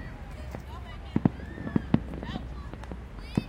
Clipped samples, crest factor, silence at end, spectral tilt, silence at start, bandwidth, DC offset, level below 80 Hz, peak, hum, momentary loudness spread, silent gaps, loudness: under 0.1%; 26 dB; 0 s; -8 dB/octave; 0 s; 15.5 kHz; under 0.1%; -42 dBFS; -6 dBFS; none; 13 LU; none; -34 LUFS